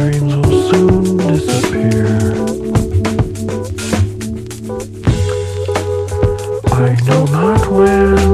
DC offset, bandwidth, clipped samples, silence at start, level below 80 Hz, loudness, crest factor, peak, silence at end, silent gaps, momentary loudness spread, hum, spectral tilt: under 0.1%; 14.5 kHz; under 0.1%; 0 s; -28 dBFS; -14 LUFS; 12 dB; 0 dBFS; 0 s; none; 10 LU; none; -7 dB/octave